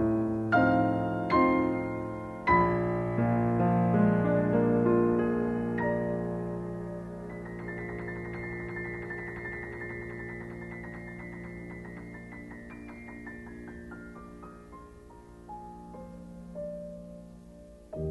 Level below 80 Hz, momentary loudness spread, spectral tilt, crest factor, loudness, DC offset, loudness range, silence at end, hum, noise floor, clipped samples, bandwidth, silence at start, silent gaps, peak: -52 dBFS; 21 LU; -9.5 dB/octave; 18 dB; -29 LUFS; under 0.1%; 18 LU; 0 s; none; -50 dBFS; under 0.1%; 8.4 kHz; 0 s; none; -12 dBFS